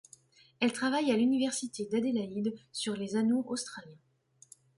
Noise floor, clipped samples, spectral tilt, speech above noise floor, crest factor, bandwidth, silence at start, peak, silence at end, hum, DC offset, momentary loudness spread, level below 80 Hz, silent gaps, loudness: -60 dBFS; under 0.1%; -4 dB/octave; 29 dB; 16 dB; 11.5 kHz; 0.6 s; -16 dBFS; 0.85 s; none; under 0.1%; 9 LU; -76 dBFS; none; -32 LUFS